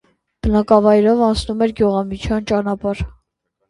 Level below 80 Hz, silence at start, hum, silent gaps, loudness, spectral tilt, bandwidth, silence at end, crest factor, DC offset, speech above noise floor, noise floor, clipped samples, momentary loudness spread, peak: -34 dBFS; 0.45 s; none; none; -17 LUFS; -7 dB/octave; 11.5 kHz; 0.6 s; 16 dB; under 0.1%; 55 dB; -71 dBFS; under 0.1%; 11 LU; 0 dBFS